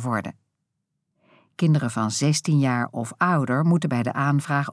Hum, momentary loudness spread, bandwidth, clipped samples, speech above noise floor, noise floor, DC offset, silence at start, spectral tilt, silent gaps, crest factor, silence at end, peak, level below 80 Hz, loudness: none; 6 LU; 11 kHz; under 0.1%; 56 dB; -78 dBFS; under 0.1%; 0 s; -6 dB/octave; none; 16 dB; 0 s; -8 dBFS; -72 dBFS; -23 LUFS